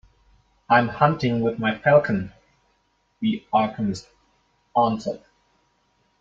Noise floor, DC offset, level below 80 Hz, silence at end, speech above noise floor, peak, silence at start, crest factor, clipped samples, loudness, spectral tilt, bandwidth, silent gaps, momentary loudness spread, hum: -68 dBFS; under 0.1%; -58 dBFS; 1.05 s; 47 dB; -2 dBFS; 0.7 s; 22 dB; under 0.1%; -22 LUFS; -7 dB/octave; 7.8 kHz; none; 12 LU; none